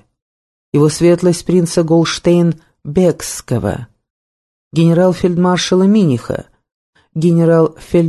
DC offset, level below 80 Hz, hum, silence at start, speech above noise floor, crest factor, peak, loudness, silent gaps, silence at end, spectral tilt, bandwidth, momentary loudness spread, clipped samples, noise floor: under 0.1%; -44 dBFS; none; 0.75 s; over 78 dB; 14 dB; 0 dBFS; -13 LUFS; 4.10-4.71 s, 6.74-6.93 s; 0 s; -6.5 dB/octave; 12.5 kHz; 10 LU; under 0.1%; under -90 dBFS